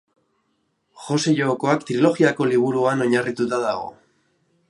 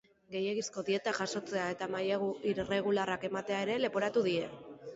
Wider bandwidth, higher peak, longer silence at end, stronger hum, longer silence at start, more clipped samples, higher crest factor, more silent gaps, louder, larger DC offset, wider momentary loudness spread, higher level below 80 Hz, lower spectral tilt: first, 11.5 kHz vs 8 kHz; first, -4 dBFS vs -18 dBFS; first, 0.75 s vs 0 s; neither; first, 0.95 s vs 0.3 s; neither; about the same, 18 dB vs 16 dB; neither; first, -20 LUFS vs -34 LUFS; neither; first, 8 LU vs 5 LU; about the same, -68 dBFS vs -68 dBFS; first, -5.5 dB/octave vs -3.5 dB/octave